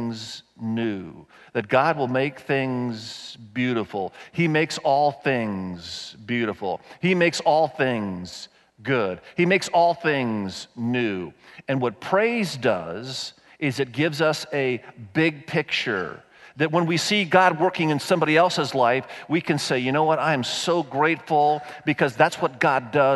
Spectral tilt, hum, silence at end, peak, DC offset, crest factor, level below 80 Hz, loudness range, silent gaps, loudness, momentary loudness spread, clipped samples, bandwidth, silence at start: -5 dB/octave; none; 0 s; -4 dBFS; under 0.1%; 20 dB; -66 dBFS; 4 LU; none; -23 LUFS; 13 LU; under 0.1%; 12 kHz; 0 s